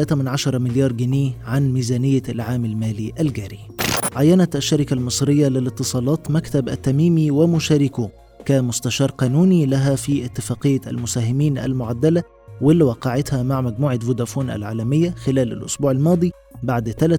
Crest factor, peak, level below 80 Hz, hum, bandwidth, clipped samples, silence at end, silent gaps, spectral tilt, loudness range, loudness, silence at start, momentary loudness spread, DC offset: 16 dB; -4 dBFS; -46 dBFS; none; over 20 kHz; under 0.1%; 0 s; none; -6 dB/octave; 2 LU; -19 LUFS; 0 s; 8 LU; under 0.1%